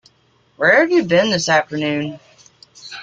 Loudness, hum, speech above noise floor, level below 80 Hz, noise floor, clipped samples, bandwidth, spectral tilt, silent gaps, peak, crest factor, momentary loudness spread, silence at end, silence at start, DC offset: -16 LUFS; none; 42 dB; -60 dBFS; -57 dBFS; under 0.1%; 9.2 kHz; -4 dB/octave; none; -2 dBFS; 16 dB; 12 LU; 0 s; 0.6 s; under 0.1%